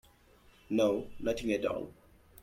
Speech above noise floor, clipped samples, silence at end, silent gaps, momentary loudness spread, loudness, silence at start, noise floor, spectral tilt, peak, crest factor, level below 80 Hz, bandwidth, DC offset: 30 dB; under 0.1%; 0 s; none; 9 LU; -33 LUFS; 0.7 s; -62 dBFS; -5.5 dB/octave; -18 dBFS; 18 dB; -58 dBFS; 15.5 kHz; under 0.1%